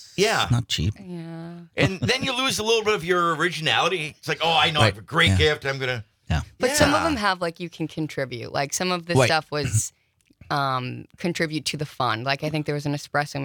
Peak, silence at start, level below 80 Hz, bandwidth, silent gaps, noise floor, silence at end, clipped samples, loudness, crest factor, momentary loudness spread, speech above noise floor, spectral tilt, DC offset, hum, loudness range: -2 dBFS; 0 s; -48 dBFS; 19.5 kHz; none; -55 dBFS; 0 s; under 0.1%; -23 LUFS; 22 dB; 11 LU; 31 dB; -4 dB/octave; under 0.1%; none; 5 LU